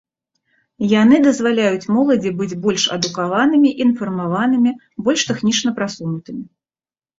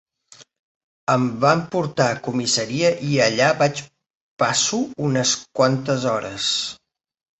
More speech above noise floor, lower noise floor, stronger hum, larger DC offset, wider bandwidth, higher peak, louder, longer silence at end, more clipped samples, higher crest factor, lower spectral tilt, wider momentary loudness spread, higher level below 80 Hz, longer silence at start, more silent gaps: first, over 74 dB vs 30 dB; first, under -90 dBFS vs -50 dBFS; neither; neither; about the same, 8 kHz vs 8.4 kHz; about the same, -2 dBFS vs -2 dBFS; first, -17 LUFS vs -20 LUFS; about the same, 0.75 s vs 0.65 s; neither; about the same, 16 dB vs 20 dB; about the same, -4.5 dB/octave vs -3.5 dB/octave; first, 10 LU vs 6 LU; about the same, -58 dBFS vs -60 dBFS; second, 0.8 s vs 1.1 s; second, none vs 4.06-4.37 s